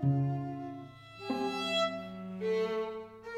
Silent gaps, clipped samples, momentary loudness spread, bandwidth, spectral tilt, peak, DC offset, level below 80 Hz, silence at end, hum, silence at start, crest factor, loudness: none; under 0.1%; 14 LU; 11.5 kHz; -6.5 dB/octave; -20 dBFS; under 0.1%; -70 dBFS; 0 s; none; 0 s; 14 dB; -35 LUFS